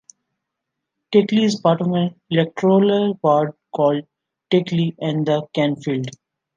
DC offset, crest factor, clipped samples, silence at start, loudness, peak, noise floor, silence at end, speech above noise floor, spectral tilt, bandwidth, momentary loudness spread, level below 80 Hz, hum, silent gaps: under 0.1%; 18 dB; under 0.1%; 1.1 s; -19 LUFS; -2 dBFS; -80 dBFS; 0.45 s; 62 dB; -7 dB/octave; 9 kHz; 8 LU; -66 dBFS; none; none